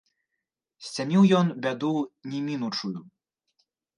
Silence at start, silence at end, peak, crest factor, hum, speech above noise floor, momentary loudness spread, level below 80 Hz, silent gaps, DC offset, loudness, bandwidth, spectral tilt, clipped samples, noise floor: 0.8 s; 0.95 s; -8 dBFS; 18 dB; none; 59 dB; 16 LU; -76 dBFS; none; under 0.1%; -26 LUFS; 10.5 kHz; -6.5 dB/octave; under 0.1%; -84 dBFS